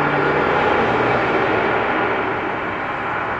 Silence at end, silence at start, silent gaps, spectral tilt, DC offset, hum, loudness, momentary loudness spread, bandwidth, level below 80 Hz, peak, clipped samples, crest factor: 0 s; 0 s; none; -6.5 dB/octave; under 0.1%; none; -18 LUFS; 6 LU; 8.4 kHz; -46 dBFS; -6 dBFS; under 0.1%; 14 dB